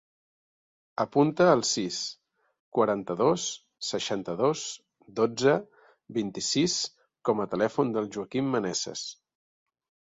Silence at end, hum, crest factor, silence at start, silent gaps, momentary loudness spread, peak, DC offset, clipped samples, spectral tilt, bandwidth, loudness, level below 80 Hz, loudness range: 0.95 s; none; 20 dB; 1 s; 2.59-2.72 s; 11 LU; -8 dBFS; under 0.1%; under 0.1%; -4 dB/octave; 8 kHz; -28 LUFS; -68 dBFS; 3 LU